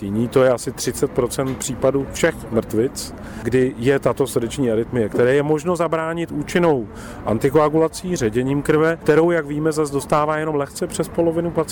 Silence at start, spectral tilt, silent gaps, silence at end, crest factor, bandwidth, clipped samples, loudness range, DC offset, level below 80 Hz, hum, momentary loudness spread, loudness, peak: 0 s; -5.5 dB/octave; none; 0 s; 14 dB; 19.5 kHz; under 0.1%; 2 LU; under 0.1%; -44 dBFS; none; 8 LU; -20 LUFS; -6 dBFS